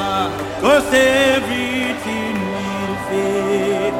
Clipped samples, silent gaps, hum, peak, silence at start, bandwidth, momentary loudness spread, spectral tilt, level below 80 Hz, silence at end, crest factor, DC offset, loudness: under 0.1%; none; none; -2 dBFS; 0 s; 17 kHz; 9 LU; -4 dB/octave; -44 dBFS; 0 s; 16 dB; under 0.1%; -17 LUFS